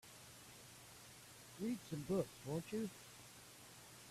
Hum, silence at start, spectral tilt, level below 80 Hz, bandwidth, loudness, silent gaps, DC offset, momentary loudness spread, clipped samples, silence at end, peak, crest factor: none; 0.05 s; -5.5 dB/octave; -74 dBFS; 15.5 kHz; -48 LUFS; none; under 0.1%; 15 LU; under 0.1%; 0 s; -26 dBFS; 22 dB